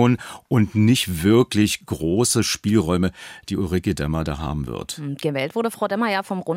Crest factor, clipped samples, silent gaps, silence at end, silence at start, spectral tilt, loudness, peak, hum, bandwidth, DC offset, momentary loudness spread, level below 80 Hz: 16 dB; under 0.1%; none; 0 s; 0 s; -5 dB/octave; -21 LUFS; -4 dBFS; none; 16 kHz; under 0.1%; 10 LU; -44 dBFS